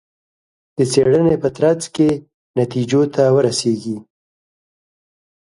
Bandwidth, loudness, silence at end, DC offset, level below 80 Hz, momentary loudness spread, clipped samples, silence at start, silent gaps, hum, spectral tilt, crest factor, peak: 11.5 kHz; -17 LUFS; 1.55 s; under 0.1%; -54 dBFS; 12 LU; under 0.1%; 0.8 s; 2.34-2.54 s; none; -6 dB/octave; 18 dB; -2 dBFS